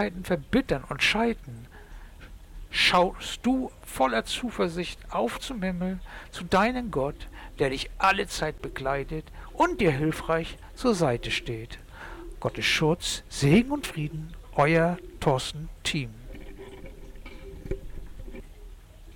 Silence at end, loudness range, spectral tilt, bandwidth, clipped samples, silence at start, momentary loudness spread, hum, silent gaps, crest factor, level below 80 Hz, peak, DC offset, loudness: 0 s; 4 LU; -5 dB/octave; 18.5 kHz; under 0.1%; 0 s; 22 LU; none; none; 16 dB; -44 dBFS; -12 dBFS; under 0.1%; -27 LUFS